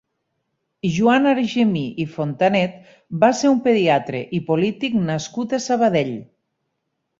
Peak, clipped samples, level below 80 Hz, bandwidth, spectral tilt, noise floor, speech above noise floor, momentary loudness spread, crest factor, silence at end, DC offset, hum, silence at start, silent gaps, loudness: -2 dBFS; under 0.1%; -58 dBFS; 7.8 kHz; -6 dB/octave; -75 dBFS; 56 dB; 10 LU; 18 dB; 0.95 s; under 0.1%; none; 0.85 s; none; -19 LUFS